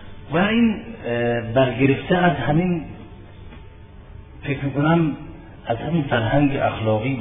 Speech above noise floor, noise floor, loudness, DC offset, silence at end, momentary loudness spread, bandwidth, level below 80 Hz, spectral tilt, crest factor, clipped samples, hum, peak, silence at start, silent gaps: 22 dB; -41 dBFS; -21 LUFS; under 0.1%; 0 s; 16 LU; 3.8 kHz; -42 dBFS; -11 dB/octave; 18 dB; under 0.1%; none; -4 dBFS; 0 s; none